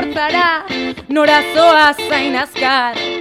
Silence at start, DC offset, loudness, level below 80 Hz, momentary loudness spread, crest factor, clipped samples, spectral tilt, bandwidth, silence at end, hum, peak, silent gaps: 0 s; under 0.1%; -13 LUFS; -52 dBFS; 9 LU; 14 dB; under 0.1%; -3 dB/octave; 16 kHz; 0 s; none; 0 dBFS; none